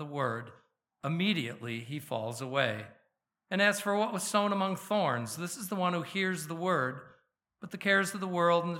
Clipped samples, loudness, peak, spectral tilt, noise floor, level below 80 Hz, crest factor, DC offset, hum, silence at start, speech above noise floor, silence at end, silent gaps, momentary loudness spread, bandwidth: under 0.1%; -31 LUFS; -12 dBFS; -4.5 dB/octave; -77 dBFS; -82 dBFS; 22 dB; under 0.1%; none; 0 s; 46 dB; 0 s; none; 13 LU; 17 kHz